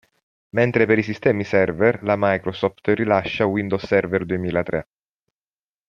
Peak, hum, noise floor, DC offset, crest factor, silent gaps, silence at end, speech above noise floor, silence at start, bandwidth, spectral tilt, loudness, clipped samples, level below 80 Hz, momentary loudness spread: -2 dBFS; none; under -90 dBFS; under 0.1%; 20 dB; none; 1.05 s; over 70 dB; 0.55 s; 7 kHz; -8 dB/octave; -20 LUFS; under 0.1%; -54 dBFS; 6 LU